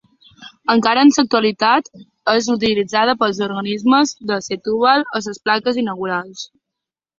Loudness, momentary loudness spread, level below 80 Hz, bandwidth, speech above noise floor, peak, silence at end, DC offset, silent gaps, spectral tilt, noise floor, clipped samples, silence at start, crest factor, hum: -17 LUFS; 11 LU; -58 dBFS; 7.8 kHz; 67 dB; -2 dBFS; 0.75 s; under 0.1%; none; -4 dB/octave; -83 dBFS; under 0.1%; 0.4 s; 16 dB; none